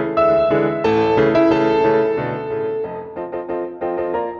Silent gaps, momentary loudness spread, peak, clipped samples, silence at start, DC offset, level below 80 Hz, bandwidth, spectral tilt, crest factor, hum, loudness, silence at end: none; 11 LU; -4 dBFS; under 0.1%; 0 s; under 0.1%; -48 dBFS; 6.8 kHz; -8 dB/octave; 14 dB; none; -18 LUFS; 0 s